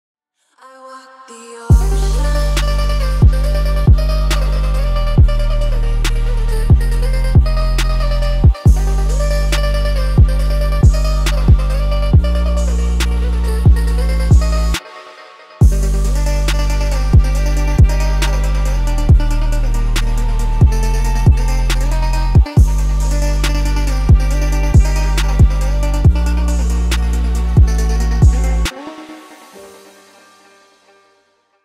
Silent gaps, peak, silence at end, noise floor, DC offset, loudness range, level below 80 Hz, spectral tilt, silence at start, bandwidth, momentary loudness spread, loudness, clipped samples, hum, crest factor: none; -2 dBFS; 1.95 s; -58 dBFS; 0.4%; 2 LU; -14 dBFS; -6 dB/octave; 0.8 s; 14 kHz; 6 LU; -15 LUFS; under 0.1%; none; 12 dB